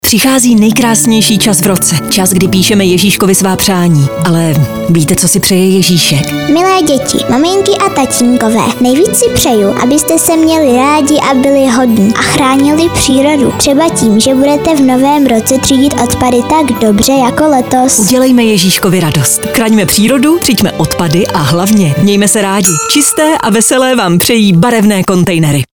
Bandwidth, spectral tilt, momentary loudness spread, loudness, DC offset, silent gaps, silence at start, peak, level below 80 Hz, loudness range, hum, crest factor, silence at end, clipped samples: over 20 kHz; -4 dB/octave; 3 LU; -7 LUFS; under 0.1%; none; 0.05 s; 0 dBFS; -34 dBFS; 1 LU; none; 8 dB; 0.1 s; 0.1%